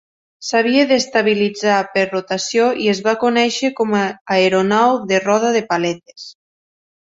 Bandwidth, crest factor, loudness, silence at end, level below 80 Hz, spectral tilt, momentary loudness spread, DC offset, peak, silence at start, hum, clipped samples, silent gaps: 8 kHz; 16 dB; -16 LUFS; 0.75 s; -62 dBFS; -4 dB/octave; 7 LU; under 0.1%; -2 dBFS; 0.4 s; none; under 0.1%; 4.21-4.25 s